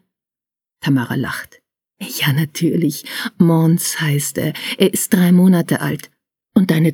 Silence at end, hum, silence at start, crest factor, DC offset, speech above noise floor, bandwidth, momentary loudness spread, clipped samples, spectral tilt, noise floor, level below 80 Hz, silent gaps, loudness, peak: 0 s; none; 0.85 s; 16 dB; under 0.1%; 73 dB; 19.5 kHz; 12 LU; under 0.1%; -5.5 dB/octave; -89 dBFS; -60 dBFS; none; -16 LUFS; 0 dBFS